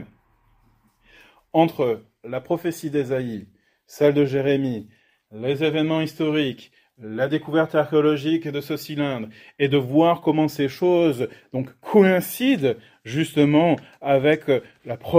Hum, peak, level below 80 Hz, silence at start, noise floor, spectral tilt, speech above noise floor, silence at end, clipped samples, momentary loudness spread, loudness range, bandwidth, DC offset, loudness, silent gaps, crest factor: none; 0 dBFS; -62 dBFS; 0 s; -61 dBFS; -6.5 dB/octave; 40 dB; 0 s; under 0.1%; 13 LU; 5 LU; 16 kHz; under 0.1%; -22 LUFS; none; 22 dB